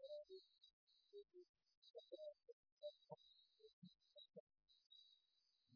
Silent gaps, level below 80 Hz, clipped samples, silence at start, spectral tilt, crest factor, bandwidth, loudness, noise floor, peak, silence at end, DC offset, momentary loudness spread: 0.73-0.87 s, 1.49-1.54 s, 1.77-1.82 s, 2.53-2.63 s, 2.72-2.77 s, 3.73-3.82 s, 4.40-4.47 s, 4.86-4.90 s; under -90 dBFS; under 0.1%; 0 s; -5 dB/octave; 22 dB; 5.4 kHz; -63 LUFS; -86 dBFS; -42 dBFS; 0 s; under 0.1%; 10 LU